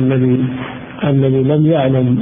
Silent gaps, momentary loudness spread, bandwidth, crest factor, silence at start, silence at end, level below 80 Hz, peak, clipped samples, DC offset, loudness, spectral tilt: none; 9 LU; 3.7 kHz; 12 dB; 0 s; 0 s; -44 dBFS; -2 dBFS; under 0.1%; under 0.1%; -14 LUFS; -14 dB/octave